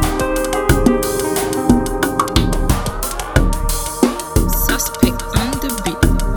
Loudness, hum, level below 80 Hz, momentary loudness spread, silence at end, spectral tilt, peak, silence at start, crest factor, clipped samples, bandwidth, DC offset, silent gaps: -17 LUFS; none; -20 dBFS; 5 LU; 0 s; -5 dB/octave; 0 dBFS; 0 s; 16 dB; under 0.1%; over 20 kHz; under 0.1%; none